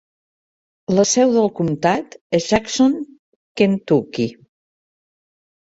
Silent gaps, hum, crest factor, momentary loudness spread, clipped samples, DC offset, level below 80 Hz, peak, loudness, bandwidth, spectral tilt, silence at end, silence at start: 2.21-2.30 s, 3.19-3.55 s; none; 18 dB; 12 LU; under 0.1%; under 0.1%; -52 dBFS; -2 dBFS; -18 LUFS; 8 kHz; -5 dB/octave; 1.45 s; 0.9 s